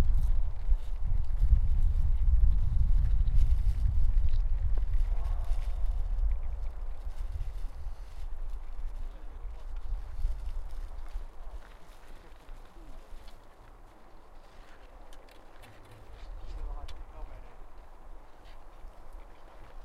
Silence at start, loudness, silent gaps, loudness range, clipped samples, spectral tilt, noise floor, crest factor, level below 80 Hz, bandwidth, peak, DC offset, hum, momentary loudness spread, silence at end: 0 s; -35 LUFS; none; 24 LU; under 0.1%; -7.5 dB/octave; -51 dBFS; 18 dB; -30 dBFS; 4 kHz; -10 dBFS; under 0.1%; none; 25 LU; 0.05 s